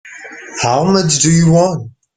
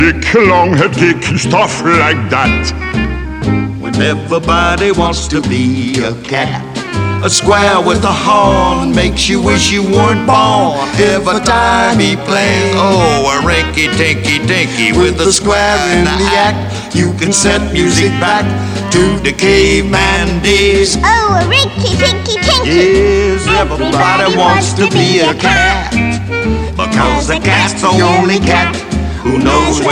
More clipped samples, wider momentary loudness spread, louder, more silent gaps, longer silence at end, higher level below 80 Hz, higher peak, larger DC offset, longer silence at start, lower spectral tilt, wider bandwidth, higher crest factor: neither; first, 18 LU vs 6 LU; about the same, -12 LUFS vs -10 LUFS; neither; first, 0.25 s vs 0 s; second, -44 dBFS vs -24 dBFS; about the same, 0 dBFS vs 0 dBFS; neither; about the same, 0.05 s vs 0 s; about the same, -4.5 dB/octave vs -4.5 dB/octave; second, 9.4 kHz vs 15.5 kHz; about the same, 12 dB vs 10 dB